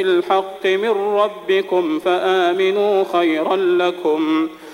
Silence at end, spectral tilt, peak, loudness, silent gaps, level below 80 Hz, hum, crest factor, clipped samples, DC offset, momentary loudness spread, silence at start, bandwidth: 0 s; -5 dB/octave; -4 dBFS; -17 LUFS; none; -66 dBFS; none; 12 dB; under 0.1%; under 0.1%; 3 LU; 0 s; 13 kHz